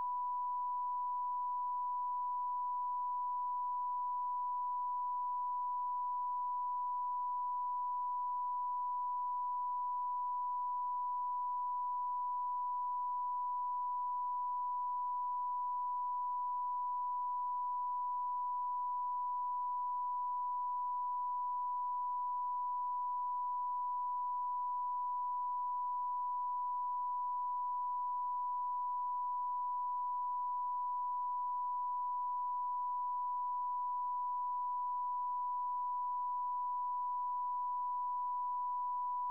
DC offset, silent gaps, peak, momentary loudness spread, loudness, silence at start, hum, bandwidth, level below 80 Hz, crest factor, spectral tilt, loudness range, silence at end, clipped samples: 0.1%; none; -34 dBFS; 0 LU; -38 LUFS; 0 s; none; 1.1 kHz; under -90 dBFS; 4 dB; -3 dB/octave; 0 LU; 0 s; under 0.1%